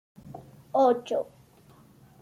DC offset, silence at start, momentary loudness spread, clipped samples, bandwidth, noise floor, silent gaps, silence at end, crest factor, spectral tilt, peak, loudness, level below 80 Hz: under 0.1%; 0.25 s; 24 LU; under 0.1%; 14 kHz; -56 dBFS; none; 1 s; 20 dB; -6 dB/octave; -10 dBFS; -26 LUFS; -68 dBFS